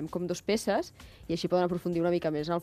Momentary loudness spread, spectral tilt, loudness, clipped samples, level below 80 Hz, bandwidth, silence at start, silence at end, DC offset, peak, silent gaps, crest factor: 7 LU; -6 dB/octave; -30 LUFS; under 0.1%; -58 dBFS; 14.5 kHz; 0 s; 0 s; under 0.1%; -14 dBFS; none; 16 dB